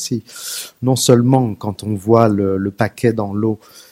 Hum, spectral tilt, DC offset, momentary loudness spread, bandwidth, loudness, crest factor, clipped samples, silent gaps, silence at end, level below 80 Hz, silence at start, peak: none; -6 dB/octave; under 0.1%; 13 LU; 16.5 kHz; -17 LUFS; 16 dB; under 0.1%; none; 0.15 s; -54 dBFS; 0 s; 0 dBFS